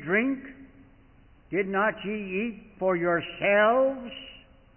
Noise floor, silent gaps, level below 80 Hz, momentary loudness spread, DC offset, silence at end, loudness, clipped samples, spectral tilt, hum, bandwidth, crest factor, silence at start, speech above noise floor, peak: -56 dBFS; none; -60 dBFS; 17 LU; under 0.1%; 0.4 s; -26 LUFS; under 0.1%; -10 dB/octave; none; 3.2 kHz; 16 dB; 0 s; 30 dB; -12 dBFS